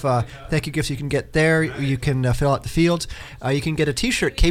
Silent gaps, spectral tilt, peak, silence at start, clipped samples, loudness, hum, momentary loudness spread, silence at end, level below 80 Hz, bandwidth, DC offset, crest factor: none; -5.5 dB/octave; -6 dBFS; 0 s; under 0.1%; -21 LUFS; none; 6 LU; 0 s; -32 dBFS; 16 kHz; under 0.1%; 16 dB